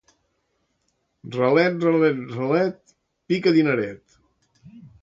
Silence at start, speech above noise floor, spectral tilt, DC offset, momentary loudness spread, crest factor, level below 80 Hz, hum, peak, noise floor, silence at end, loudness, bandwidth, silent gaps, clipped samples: 1.25 s; 52 dB; -7.5 dB/octave; under 0.1%; 8 LU; 18 dB; -66 dBFS; none; -6 dBFS; -72 dBFS; 0.15 s; -21 LUFS; 7.6 kHz; none; under 0.1%